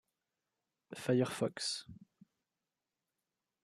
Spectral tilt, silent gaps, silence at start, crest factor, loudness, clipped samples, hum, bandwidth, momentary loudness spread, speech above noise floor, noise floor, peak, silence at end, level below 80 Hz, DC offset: -4.5 dB/octave; none; 0.9 s; 22 dB; -36 LUFS; under 0.1%; none; 14 kHz; 17 LU; over 54 dB; under -90 dBFS; -20 dBFS; 1.7 s; -78 dBFS; under 0.1%